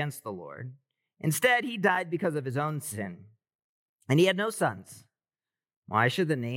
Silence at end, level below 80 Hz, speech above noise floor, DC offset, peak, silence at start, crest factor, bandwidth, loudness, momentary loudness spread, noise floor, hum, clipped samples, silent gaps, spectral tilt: 0 s; -84 dBFS; over 62 dB; under 0.1%; -10 dBFS; 0 s; 20 dB; 17.5 kHz; -28 LUFS; 16 LU; under -90 dBFS; none; under 0.1%; 3.55-3.96 s, 5.76-5.82 s; -5 dB/octave